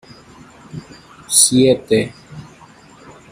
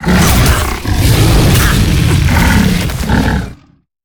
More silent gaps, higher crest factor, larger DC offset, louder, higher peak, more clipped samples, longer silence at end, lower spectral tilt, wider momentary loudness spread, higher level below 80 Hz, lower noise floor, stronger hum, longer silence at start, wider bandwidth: neither; first, 20 dB vs 10 dB; neither; about the same, -13 LUFS vs -11 LUFS; about the same, 0 dBFS vs 0 dBFS; neither; first, 0.9 s vs 0.5 s; second, -3 dB/octave vs -5 dB/octave; first, 27 LU vs 7 LU; second, -52 dBFS vs -16 dBFS; first, -44 dBFS vs -34 dBFS; neither; first, 0.75 s vs 0 s; second, 15.5 kHz vs over 20 kHz